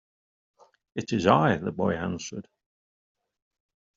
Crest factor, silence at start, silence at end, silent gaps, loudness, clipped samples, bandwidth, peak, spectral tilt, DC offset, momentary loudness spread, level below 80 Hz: 26 dB; 0.95 s; 1.55 s; none; -26 LUFS; under 0.1%; 7.8 kHz; -4 dBFS; -5.5 dB/octave; under 0.1%; 17 LU; -62 dBFS